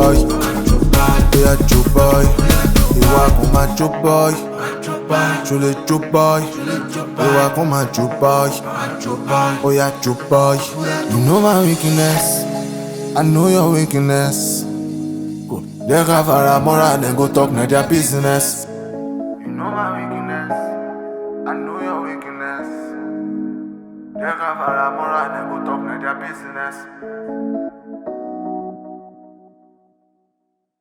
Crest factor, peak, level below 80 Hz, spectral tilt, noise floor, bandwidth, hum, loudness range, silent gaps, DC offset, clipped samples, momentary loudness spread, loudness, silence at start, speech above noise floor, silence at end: 16 dB; 0 dBFS; -24 dBFS; -5.5 dB/octave; -71 dBFS; over 20 kHz; none; 12 LU; none; under 0.1%; under 0.1%; 14 LU; -16 LUFS; 0 s; 57 dB; 1.7 s